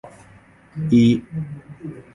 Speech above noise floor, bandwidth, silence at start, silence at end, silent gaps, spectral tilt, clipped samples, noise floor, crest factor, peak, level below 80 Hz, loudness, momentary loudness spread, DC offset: 30 dB; 7.4 kHz; 0.05 s; 0.15 s; none; -8 dB/octave; under 0.1%; -49 dBFS; 16 dB; -6 dBFS; -52 dBFS; -19 LUFS; 21 LU; under 0.1%